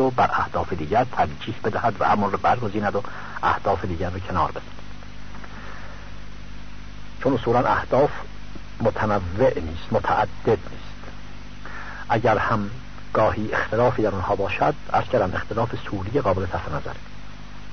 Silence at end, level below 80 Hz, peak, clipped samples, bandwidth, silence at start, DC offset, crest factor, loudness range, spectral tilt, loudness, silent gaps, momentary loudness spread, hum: 0 s; -42 dBFS; -8 dBFS; under 0.1%; 6.6 kHz; 0 s; 2%; 16 dB; 5 LU; -7 dB/octave; -23 LUFS; none; 20 LU; 50 Hz at -40 dBFS